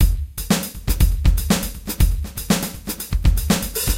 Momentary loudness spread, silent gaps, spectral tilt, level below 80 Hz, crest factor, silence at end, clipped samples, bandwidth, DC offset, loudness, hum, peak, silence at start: 8 LU; none; -4.5 dB/octave; -20 dBFS; 14 dB; 0 s; under 0.1%; 17 kHz; under 0.1%; -21 LUFS; none; -6 dBFS; 0 s